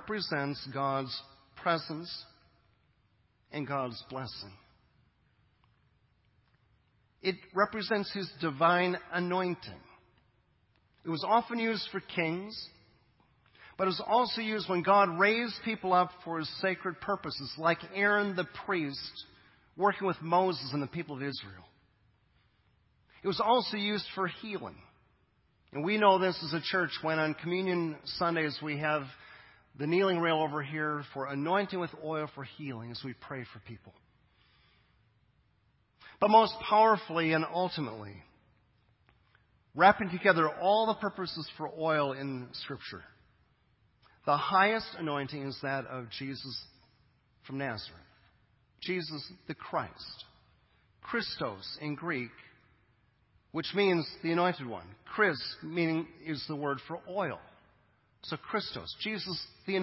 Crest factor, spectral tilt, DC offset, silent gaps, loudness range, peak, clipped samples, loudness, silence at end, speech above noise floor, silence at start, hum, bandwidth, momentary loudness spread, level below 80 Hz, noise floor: 26 dB; -9 dB/octave; under 0.1%; none; 12 LU; -8 dBFS; under 0.1%; -31 LUFS; 0 s; 39 dB; 0 s; none; 5.8 kHz; 16 LU; -68 dBFS; -71 dBFS